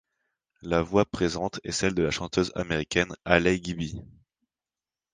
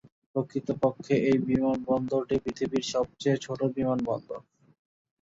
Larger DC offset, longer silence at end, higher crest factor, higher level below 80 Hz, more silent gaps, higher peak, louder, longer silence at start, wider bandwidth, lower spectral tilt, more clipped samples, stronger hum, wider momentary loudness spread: neither; first, 1.1 s vs 0.8 s; first, 26 dB vs 18 dB; first, -48 dBFS vs -58 dBFS; neither; first, -2 dBFS vs -10 dBFS; about the same, -27 LUFS vs -28 LUFS; first, 0.65 s vs 0.35 s; first, 10 kHz vs 7.8 kHz; second, -5 dB/octave vs -6.5 dB/octave; neither; neither; first, 11 LU vs 8 LU